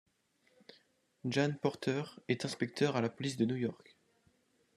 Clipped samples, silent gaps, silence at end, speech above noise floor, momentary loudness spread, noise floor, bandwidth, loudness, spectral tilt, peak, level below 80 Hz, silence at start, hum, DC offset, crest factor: under 0.1%; none; 1 s; 39 dB; 6 LU; -74 dBFS; 13 kHz; -36 LUFS; -6 dB/octave; -16 dBFS; -78 dBFS; 1.25 s; none; under 0.1%; 20 dB